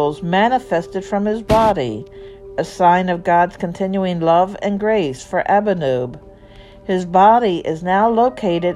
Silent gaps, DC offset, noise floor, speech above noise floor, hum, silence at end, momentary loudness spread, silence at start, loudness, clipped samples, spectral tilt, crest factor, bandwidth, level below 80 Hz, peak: none; under 0.1%; -41 dBFS; 25 dB; none; 0 s; 11 LU; 0 s; -17 LUFS; under 0.1%; -6.5 dB/octave; 16 dB; 13 kHz; -42 dBFS; 0 dBFS